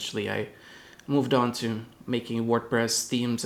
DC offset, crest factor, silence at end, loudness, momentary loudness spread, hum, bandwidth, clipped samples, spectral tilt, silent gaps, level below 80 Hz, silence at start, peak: under 0.1%; 18 dB; 0 s; -27 LUFS; 15 LU; none; 17.5 kHz; under 0.1%; -4 dB/octave; none; -66 dBFS; 0 s; -10 dBFS